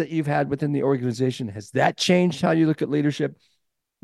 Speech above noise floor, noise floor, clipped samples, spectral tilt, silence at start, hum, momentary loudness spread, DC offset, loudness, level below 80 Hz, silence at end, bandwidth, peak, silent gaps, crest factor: 53 dB; -75 dBFS; under 0.1%; -6 dB/octave; 0 s; none; 8 LU; under 0.1%; -23 LUFS; -64 dBFS; 0.7 s; 12.5 kHz; -6 dBFS; none; 18 dB